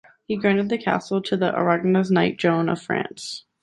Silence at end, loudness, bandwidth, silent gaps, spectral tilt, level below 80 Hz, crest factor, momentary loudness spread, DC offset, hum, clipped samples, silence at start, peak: 0.2 s; -22 LUFS; 11.5 kHz; none; -6.5 dB/octave; -62 dBFS; 18 dB; 10 LU; under 0.1%; none; under 0.1%; 0.3 s; -4 dBFS